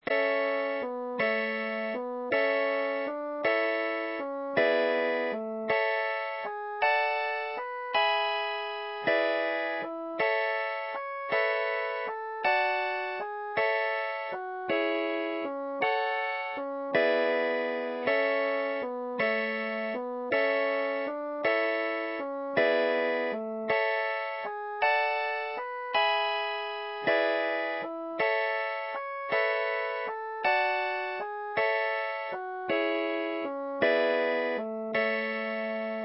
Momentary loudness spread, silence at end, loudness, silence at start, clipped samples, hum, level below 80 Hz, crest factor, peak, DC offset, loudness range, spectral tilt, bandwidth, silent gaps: 8 LU; 0 s; -29 LUFS; 0.05 s; under 0.1%; none; -78 dBFS; 16 dB; -14 dBFS; under 0.1%; 2 LU; -7.5 dB/octave; 5.8 kHz; none